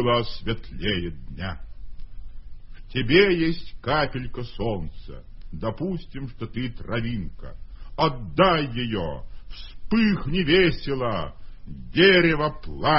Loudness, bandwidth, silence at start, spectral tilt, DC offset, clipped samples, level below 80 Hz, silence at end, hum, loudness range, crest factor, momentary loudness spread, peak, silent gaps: -24 LUFS; 5.8 kHz; 0 s; -10 dB/octave; under 0.1%; under 0.1%; -40 dBFS; 0 s; none; 9 LU; 22 dB; 23 LU; -2 dBFS; none